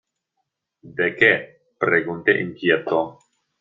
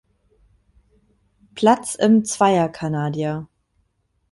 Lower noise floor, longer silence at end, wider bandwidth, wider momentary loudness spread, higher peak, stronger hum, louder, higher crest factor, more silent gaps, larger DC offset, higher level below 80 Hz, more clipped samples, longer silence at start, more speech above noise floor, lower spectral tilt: first, -77 dBFS vs -68 dBFS; second, 0.5 s vs 0.85 s; second, 7.4 kHz vs 11.5 kHz; about the same, 8 LU vs 10 LU; about the same, -2 dBFS vs -4 dBFS; neither; about the same, -20 LUFS vs -19 LUFS; about the same, 20 dB vs 18 dB; neither; neither; second, -66 dBFS vs -58 dBFS; neither; second, 0.85 s vs 1.55 s; first, 57 dB vs 50 dB; first, -7 dB/octave vs -5.5 dB/octave